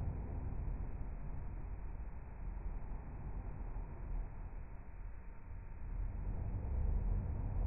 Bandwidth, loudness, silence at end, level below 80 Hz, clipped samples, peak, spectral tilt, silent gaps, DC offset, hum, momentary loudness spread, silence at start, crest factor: 2.7 kHz; -46 LUFS; 0 s; -42 dBFS; under 0.1%; -26 dBFS; -8.5 dB/octave; none; under 0.1%; none; 12 LU; 0 s; 14 dB